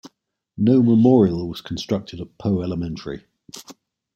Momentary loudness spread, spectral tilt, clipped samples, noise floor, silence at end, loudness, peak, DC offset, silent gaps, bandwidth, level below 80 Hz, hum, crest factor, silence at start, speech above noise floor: 24 LU; -8 dB/octave; under 0.1%; -67 dBFS; 0.45 s; -20 LUFS; -2 dBFS; under 0.1%; none; 12.5 kHz; -52 dBFS; none; 18 dB; 0.05 s; 47 dB